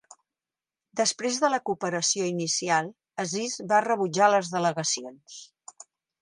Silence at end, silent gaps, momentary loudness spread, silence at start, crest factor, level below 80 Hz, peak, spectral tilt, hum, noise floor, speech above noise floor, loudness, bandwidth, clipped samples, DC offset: 0.75 s; none; 20 LU; 0.95 s; 20 dB; -78 dBFS; -8 dBFS; -3 dB/octave; none; under -90 dBFS; over 64 dB; -26 LUFS; 11.5 kHz; under 0.1%; under 0.1%